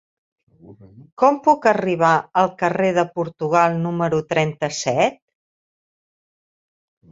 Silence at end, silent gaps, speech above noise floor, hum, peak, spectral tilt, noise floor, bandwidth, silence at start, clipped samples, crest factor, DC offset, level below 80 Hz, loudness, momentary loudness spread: 2 s; 1.12-1.17 s; over 71 dB; none; -2 dBFS; -5.5 dB/octave; under -90 dBFS; 7.8 kHz; 0.7 s; under 0.1%; 20 dB; under 0.1%; -62 dBFS; -19 LUFS; 5 LU